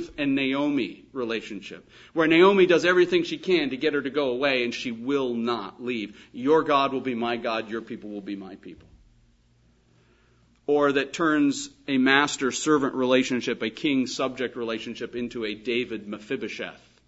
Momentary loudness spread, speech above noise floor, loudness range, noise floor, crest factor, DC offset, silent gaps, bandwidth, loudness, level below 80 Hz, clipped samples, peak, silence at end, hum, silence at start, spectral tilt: 15 LU; 37 dB; 9 LU; -62 dBFS; 22 dB; under 0.1%; none; 8 kHz; -24 LUFS; -64 dBFS; under 0.1%; -4 dBFS; 0.3 s; none; 0 s; -4.5 dB/octave